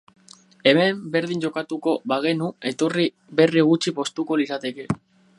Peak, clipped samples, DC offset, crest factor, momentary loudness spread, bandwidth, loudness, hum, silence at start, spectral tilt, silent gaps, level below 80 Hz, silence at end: -2 dBFS; under 0.1%; under 0.1%; 20 dB; 10 LU; 11.5 kHz; -22 LUFS; none; 0.65 s; -5.5 dB/octave; none; -64 dBFS; 0.45 s